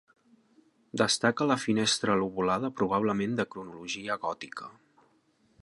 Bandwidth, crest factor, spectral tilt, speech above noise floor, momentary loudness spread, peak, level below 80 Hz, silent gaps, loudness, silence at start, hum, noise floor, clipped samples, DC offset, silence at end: 11.5 kHz; 20 dB; -4 dB/octave; 39 dB; 14 LU; -10 dBFS; -66 dBFS; none; -29 LUFS; 0.95 s; none; -68 dBFS; under 0.1%; under 0.1%; 0.95 s